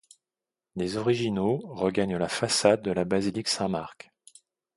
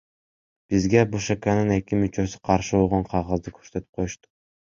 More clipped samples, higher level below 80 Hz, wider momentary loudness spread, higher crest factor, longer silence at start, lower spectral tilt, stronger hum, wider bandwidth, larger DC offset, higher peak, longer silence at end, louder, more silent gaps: neither; second, -58 dBFS vs -44 dBFS; about the same, 10 LU vs 12 LU; about the same, 24 dB vs 22 dB; about the same, 0.75 s vs 0.7 s; second, -4.5 dB/octave vs -6.5 dB/octave; neither; first, 11.5 kHz vs 7.6 kHz; neither; second, -6 dBFS vs -2 dBFS; first, 0.85 s vs 0.55 s; second, -27 LUFS vs -24 LUFS; second, none vs 3.89-3.93 s